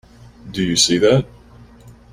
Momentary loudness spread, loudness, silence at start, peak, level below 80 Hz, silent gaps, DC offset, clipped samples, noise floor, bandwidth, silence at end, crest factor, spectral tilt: 17 LU; -15 LUFS; 0.45 s; -2 dBFS; -46 dBFS; none; under 0.1%; under 0.1%; -44 dBFS; 16 kHz; 0.2 s; 18 dB; -4 dB/octave